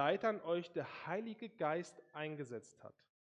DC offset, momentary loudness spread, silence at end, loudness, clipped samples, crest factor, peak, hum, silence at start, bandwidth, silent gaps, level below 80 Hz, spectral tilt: under 0.1%; 15 LU; 0.4 s; -42 LUFS; under 0.1%; 22 dB; -20 dBFS; none; 0 s; 10.5 kHz; none; -86 dBFS; -6 dB/octave